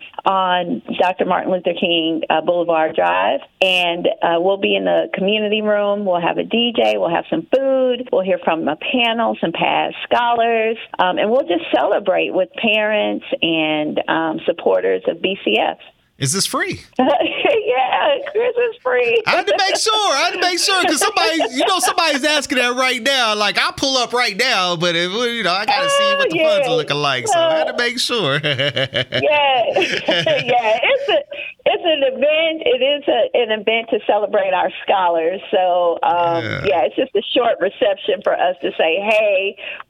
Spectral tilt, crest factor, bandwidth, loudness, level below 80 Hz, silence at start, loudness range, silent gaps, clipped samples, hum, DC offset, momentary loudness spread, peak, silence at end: -3 dB/octave; 16 dB; 16 kHz; -17 LUFS; -60 dBFS; 0 s; 2 LU; none; under 0.1%; none; under 0.1%; 4 LU; 0 dBFS; 0.1 s